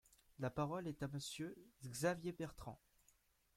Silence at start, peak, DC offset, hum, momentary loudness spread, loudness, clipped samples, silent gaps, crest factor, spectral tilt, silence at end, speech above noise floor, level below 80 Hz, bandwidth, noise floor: 0.4 s; -24 dBFS; under 0.1%; none; 15 LU; -45 LUFS; under 0.1%; none; 22 dB; -5 dB/octave; 0.8 s; 31 dB; -70 dBFS; 16.5 kHz; -77 dBFS